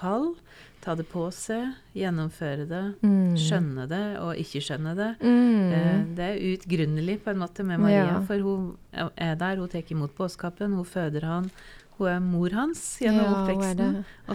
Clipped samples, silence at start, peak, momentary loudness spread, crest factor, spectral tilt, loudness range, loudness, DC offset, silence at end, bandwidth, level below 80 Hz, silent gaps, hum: under 0.1%; 0 s; -8 dBFS; 10 LU; 18 dB; -6.5 dB/octave; 5 LU; -27 LUFS; under 0.1%; 0 s; 14 kHz; -52 dBFS; none; none